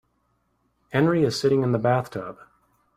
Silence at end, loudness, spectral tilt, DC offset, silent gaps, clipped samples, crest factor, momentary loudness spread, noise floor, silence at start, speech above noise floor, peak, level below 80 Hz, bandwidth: 0.65 s; -23 LUFS; -6.5 dB/octave; under 0.1%; none; under 0.1%; 18 dB; 13 LU; -70 dBFS; 0.9 s; 48 dB; -8 dBFS; -60 dBFS; 15 kHz